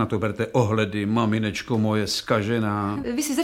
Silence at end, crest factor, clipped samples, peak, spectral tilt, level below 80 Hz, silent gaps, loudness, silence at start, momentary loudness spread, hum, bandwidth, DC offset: 0 s; 18 dB; under 0.1%; -6 dBFS; -5.5 dB/octave; -52 dBFS; none; -24 LUFS; 0 s; 3 LU; none; 16.5 kHz; under 0.1%